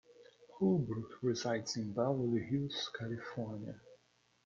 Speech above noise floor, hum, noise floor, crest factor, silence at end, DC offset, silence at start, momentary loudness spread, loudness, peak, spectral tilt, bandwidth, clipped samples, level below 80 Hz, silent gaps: 36 dB; none; -73 dBFS; 18 dB; 0.5 s; under 0.1%; 0.1 s; 10 LU; -37 LUFS; -20 dBFS; -6 dB/octave; 7.6 kHz; under 0.1%; -70 dBFS; none